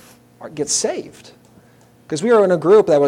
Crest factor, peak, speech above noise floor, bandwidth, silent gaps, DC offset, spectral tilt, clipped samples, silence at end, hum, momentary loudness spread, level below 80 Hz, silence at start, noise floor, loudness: 16 dB; -2 dBFS; 34 dB; 13 kHz; none; under 0.1%; -4 dB/octave; under 0.1%; 0 s; none; 19 LU; -62 dBFS; 0.4 s; -50 dBFS; -16 LUFS